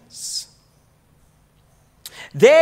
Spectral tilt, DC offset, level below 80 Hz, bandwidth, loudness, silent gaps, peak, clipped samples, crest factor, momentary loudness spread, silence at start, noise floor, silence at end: -3.5 dB/octave; under 0.1%; -62 dBFS; 16 kHz; -19 LUFS; none; 0 dBFS; under 0.1%; 20 dB; 26 LU; 0.2 s; -57 dBFS; 0 s